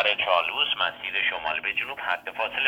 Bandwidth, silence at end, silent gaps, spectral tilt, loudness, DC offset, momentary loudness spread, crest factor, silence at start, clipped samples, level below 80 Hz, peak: 19 kHz; 0 s; none; -2.5 dB/octave; -25 LUFS; under 0.1%; 6 LU; 20 dB; 0 s; under 0.1%; -64 dBFS; -6 dBFS